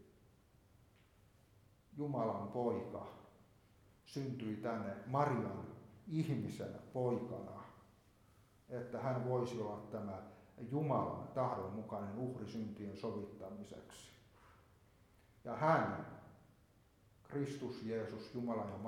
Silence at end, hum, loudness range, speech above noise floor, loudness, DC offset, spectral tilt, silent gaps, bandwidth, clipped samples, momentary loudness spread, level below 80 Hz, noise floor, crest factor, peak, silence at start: 0 s; none; 4 LU; 28 dB; -42 LUFS; under 0.1%; -7.5 dB/octave; none; 16 kHz; under 0.1%; 17 LU; -74 dBFS; -70 dBFS; 24 dB; -20 dBFS; 0 s